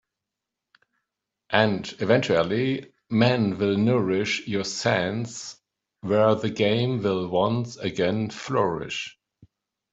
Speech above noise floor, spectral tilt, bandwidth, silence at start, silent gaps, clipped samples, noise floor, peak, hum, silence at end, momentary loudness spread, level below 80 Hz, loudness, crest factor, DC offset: 62 dB; -5.5 dB/octave; 8 kHz; 1.5 s; none; under 0.1%; -86 dBFS; -4 dBFS; none; 0.8 s; 10 LU; -62 dBFS; -24 LUFS; 22 dB; under 0.1%